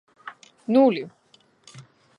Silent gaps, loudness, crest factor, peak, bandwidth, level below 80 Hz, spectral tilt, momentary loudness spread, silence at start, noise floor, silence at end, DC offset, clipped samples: none; -21 LUFS; 18 dB; -6 dBFS; 10 kHz; -78 dBFS; -7 dB/octave; 24 LU; 0.25 s; -56 dBFS; 0.4 s; under 0.1%; under 0.1%